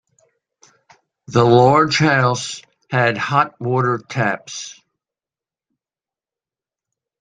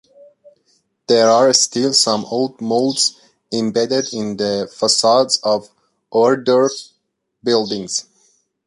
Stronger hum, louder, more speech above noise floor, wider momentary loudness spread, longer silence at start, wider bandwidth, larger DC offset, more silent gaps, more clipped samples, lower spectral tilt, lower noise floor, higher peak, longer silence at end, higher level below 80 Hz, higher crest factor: neither; about the same, -16 LUFS vs -16 LUFS; first, over 74 dB vs 54 dB; first, 17 LU vs 10 LU; first, 1.3 s vs 1.1 s; second, 9.6 kHz vs 11.5 kHz; neither; neither; neither; first, -5.5 dB/octave vs -3 dB/octave; first, under -90 dBFS vs -70 dBFS; about the same, -2 dBFS vs 0 dBFS; first, 2.5 s vs 0.65 s; first, -58 dBFS vs -64 dBFS; about the same, 18 dB vs 18 dB